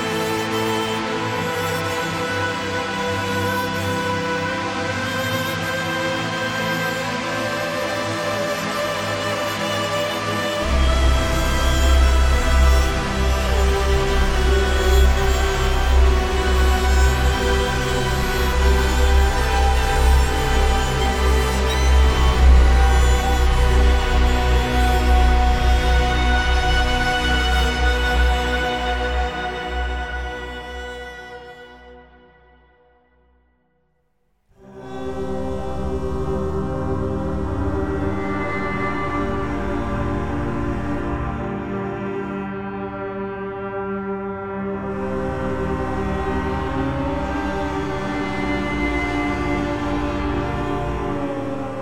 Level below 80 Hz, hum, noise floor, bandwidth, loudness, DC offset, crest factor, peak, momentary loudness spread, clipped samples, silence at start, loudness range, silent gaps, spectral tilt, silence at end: -22 dBFS; none; -67 dBFS; 15.5 kHz; -21 LUFS; under 0.1%; 16 dB; -4 dBFS; 9 LU; under 0.1%; 0 s; 10 LU; none; -5 dB/octave; 0 s